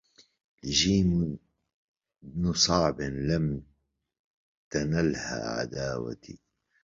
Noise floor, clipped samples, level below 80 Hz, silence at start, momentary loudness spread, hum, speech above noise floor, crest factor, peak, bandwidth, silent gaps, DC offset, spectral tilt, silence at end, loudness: -74 dBFS; under 0.1%; -48 dBFS; 0.65 s; 16 LU; none; 46 dB; 20 dB; -10 dBFS; 7.6 kHz; 1.74-1.95 s, 4.19-4.71 s; under 0.1%; -4.5 dB/octave; 0.45 s; -28 LUFS